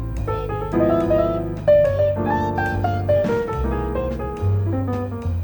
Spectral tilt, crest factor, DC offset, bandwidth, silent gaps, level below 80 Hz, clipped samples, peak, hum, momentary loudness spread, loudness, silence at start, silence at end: -9 dB/octave; 14 dB; under 0.1%; over 20 kHz; none; -32 dBFS; under 0.1%; -6 dBFS; none; 8 LU; -21 LUFS; 0 s; 0 s